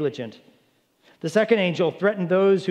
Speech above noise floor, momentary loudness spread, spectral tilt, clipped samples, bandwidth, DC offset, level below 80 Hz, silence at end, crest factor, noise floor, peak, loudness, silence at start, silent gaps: 42 dB; 15 LU; -6.5 dB/octave; under 0.1%; 11.5 kHz; under 0.1%; -78 dBFS; 0 s; 18 dB; -63 dBFS; -6 dBFS; -21 LUFS; 0 s; none